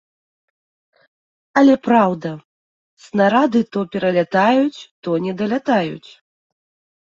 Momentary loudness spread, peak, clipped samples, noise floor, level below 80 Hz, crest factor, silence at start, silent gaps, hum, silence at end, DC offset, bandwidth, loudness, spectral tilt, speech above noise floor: 13 LU; -2 dBFS; under 0.1%; under -90 dBFS; -64 dBFS; 18 dB; 1.55 s; 2.45-2.97 s, 4.91-5.03 s; none; 1.05 s; under 0.1%; 7.6 kHz; -17 LUFS; -7 dB/octave; over 73 dB